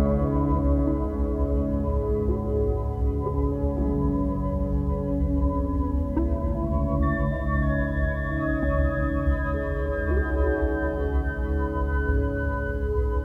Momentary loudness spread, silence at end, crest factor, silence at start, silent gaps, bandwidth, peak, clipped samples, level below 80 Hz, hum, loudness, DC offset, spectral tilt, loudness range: 3 LU; 0 s; 14 dB; 0 s; none; 3.8 kHz; -10 dBFS; under 0.1%; -26 dBFS; none; -26 LUFS; under 0.1%; -10.5 dB/octave; 1 LU